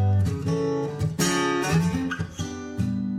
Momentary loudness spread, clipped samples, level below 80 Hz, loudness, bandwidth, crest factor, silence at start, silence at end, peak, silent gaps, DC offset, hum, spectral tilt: 8 LU; under 0.1%; -46 dBFS; -25 LUFS; 15 kHz; 14 dB; 0 s; 0 s; -10 dBFS; none; under 0.1%; none; -5.5 dB/octave